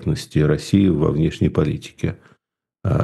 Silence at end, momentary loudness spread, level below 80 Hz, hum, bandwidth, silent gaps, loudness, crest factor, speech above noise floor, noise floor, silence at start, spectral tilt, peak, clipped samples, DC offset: 0 s; 10 LU; -38 dBFS; none; 12.5 kHz; none; -20 LUFS; 18 dB; 55 dB; -73 dBFS; 0 s; -7.5 dB/octave; -2 dBFS; under 0.1%; under 0.1%